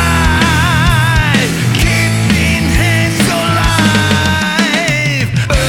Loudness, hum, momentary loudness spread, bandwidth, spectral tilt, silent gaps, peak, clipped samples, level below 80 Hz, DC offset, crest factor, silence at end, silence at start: -11 LUFS; none; 2 LU; 18 kHz; -4.5 dB/octave; none; 0 dBFS; under 0.1%; -22 dBFS; under 0.1%; 10 dB; 0 s; 0 s